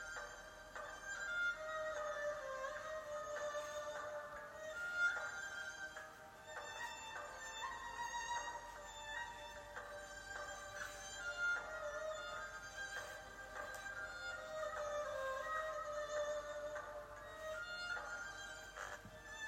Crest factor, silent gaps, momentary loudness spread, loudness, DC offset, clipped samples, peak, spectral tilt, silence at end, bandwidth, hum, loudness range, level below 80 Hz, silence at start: 18 dB; none; 10 LU; -46 LUFS; under 0.1%; under 0.1%; -28 dBFS; -1.5 dB/octave; 0 s; 16 kHz; none; 3 LU; -68 dBFS; 0 s